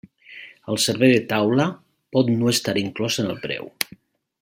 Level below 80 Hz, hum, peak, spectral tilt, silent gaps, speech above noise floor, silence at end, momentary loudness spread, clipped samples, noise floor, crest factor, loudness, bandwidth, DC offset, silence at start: -62 dBFS; none; 0 dBFS; -4.5 dB/octave; none; 30 dB; 0.55 s; 15 LU; under 0.1%; -50 dBFS; 22 dB; -21 LUFS; 16.5 kHz; under 0.1%; 0.3 s